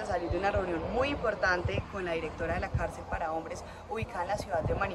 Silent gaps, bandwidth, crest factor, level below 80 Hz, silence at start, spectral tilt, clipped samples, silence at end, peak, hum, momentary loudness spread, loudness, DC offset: none; 13 kHz; 16 dB; -44 dBFS; 0 s; -6 dB/octave; under 0.1%; 0 s; -16 dBFS; none; 8 LU; -33 LUFS; under 0.1%